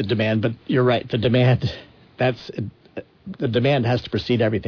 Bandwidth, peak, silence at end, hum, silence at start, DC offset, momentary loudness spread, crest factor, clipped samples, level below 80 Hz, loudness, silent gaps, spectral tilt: 5.4 kHz; -8 dBFS; 0 s; none; 0 s; under 0.1%; 19 LU; 14 dB; under 0.1%; -50 dBFS; -21 LUFS; none; -8 dB/octave